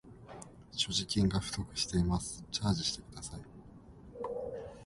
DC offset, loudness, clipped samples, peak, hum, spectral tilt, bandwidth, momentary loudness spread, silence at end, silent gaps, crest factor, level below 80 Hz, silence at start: under 0.1%; -35 LUFS; under 0.1%; -18 dBFS; none; -4.5 dB/octave; 11.5 kHz; 21 LU; 0 s; none; 18 dB; -50 dBFS; 0.05 s